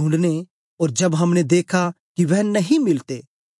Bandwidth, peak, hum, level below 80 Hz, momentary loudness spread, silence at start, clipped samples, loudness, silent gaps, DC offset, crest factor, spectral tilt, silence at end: 11.5 kHz; -6 dBFS; none; -70 dBFS; 7 LU; 0 s; under 0.1%; -19 LUFS; 0.50-0.77 s, 1.99-2.15 s; under 0.1%; 14 dB; -6 dB/octave; 0.4 s